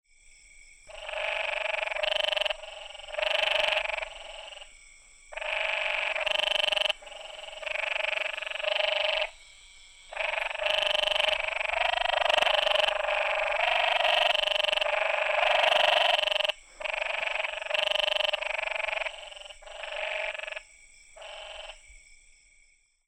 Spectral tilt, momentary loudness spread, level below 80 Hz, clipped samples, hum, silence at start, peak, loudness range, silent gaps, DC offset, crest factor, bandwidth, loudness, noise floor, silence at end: 1 dB/octave; 18 LU; -58 dBFS; under 0.1%; none; 0.6 s; -12 dBFS; 7 LU; none; under 0.1%; 18 dB; 16 kHz; -27 LUFS; -64 dBFS; 0.95 s